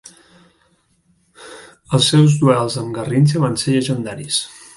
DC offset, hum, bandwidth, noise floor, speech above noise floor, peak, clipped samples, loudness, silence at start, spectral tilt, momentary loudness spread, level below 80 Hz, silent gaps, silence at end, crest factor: under 0.1%; none; 11.5 kHz; -60 dBFS; 44 dB; 0 dBFS; under 0.1%; -16 LUFS; 1.4 s; -5.5 dB/octave; 12 LU; -54 dBFS; none; 0.3 s; 18 dB